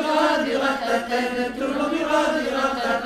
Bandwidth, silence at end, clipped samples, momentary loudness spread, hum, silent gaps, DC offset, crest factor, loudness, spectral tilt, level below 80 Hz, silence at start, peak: 15.5 kHz; 0 s; under 0.1%; 5 LU; none; none; under 0.1%; 16 dB; -22 LUFS; -3.5 dB/octave; -52 dBFS; 0 s; -8 dBFS